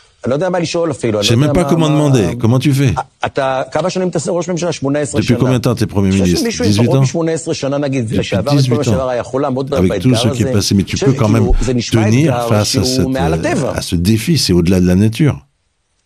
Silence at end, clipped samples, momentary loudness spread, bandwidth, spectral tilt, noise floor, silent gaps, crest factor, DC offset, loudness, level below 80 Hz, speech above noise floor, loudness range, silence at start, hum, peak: 0.65 s; under 0.1%; 5 LU; 14.5 kHz; -6 dB/octave; -63 dBFS; none; 14 dB; under 0.1%; -14 LUFS; -30 dBFS; 50 dB; 2 LU; 0.25 s; none; 0 dBFS